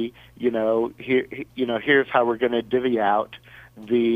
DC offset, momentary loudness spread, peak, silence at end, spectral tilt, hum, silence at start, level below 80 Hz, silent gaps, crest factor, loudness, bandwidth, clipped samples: under 0.1%; 14 LU; -6 dBFS; 0 s; -7 dB/octave; none; 0 s; -60 dBFS; none; 18 dB; -22 LUFS; 4.9 kHz; under 0.1%